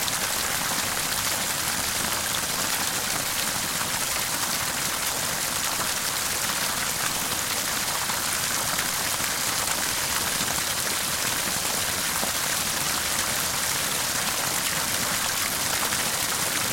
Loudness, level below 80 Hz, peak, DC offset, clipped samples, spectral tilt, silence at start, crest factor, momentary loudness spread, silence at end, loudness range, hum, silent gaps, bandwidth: -24 LUFS; -50 dBFS; -8 dBFS; under 0.1%; under 0.1%; -0.5 dB/octave; 0 s; 20 dB; 1 LU; 0 s; 1 LU; none; none; 17 kHz